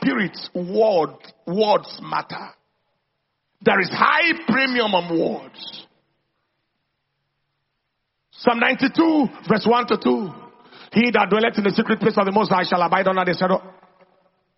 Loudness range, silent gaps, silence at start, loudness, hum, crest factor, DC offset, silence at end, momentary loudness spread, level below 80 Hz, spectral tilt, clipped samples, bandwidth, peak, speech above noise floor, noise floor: 6 LU; none; 0 s; -19 LUFS; none; 20 dB; under 0.1%; 0.85 s; 11 LU; -64 dBFS; -3.5 dB/octave; under 0.1%; 6 kHz; -2 dBFS; 56 dB; -75 dBFS